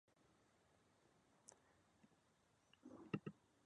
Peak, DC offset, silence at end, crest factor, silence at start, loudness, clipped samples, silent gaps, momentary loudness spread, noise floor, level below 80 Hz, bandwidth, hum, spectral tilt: -28 dBFS; under 0.1%; 0.3 s; 32 dB; 0.3 s; -54 LUFS; under 0.1%; none; 16 LU; -79 dBFS; -88 dBFS; 9.6 kHz; none; -6 dB/octave